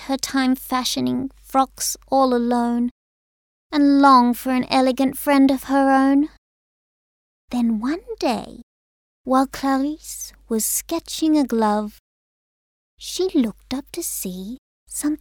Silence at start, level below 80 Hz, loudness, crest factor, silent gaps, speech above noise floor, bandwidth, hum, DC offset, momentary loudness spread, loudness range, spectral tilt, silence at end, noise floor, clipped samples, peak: 0 s; -52 dBFS; -20 LUFS; 18 dB; 2.91-3.70 s, 6.38-7.48 s, 8.63-9.24 s, 12.00-12.97 s, 14.58-14.86 s; over 70 dB; over 20 kHz; none; under 0.1%; 14 LU; 8 LU; -3.5 dB/octave; 0.05 s; under -90 dBFS; under 0.1%; -2 dBFS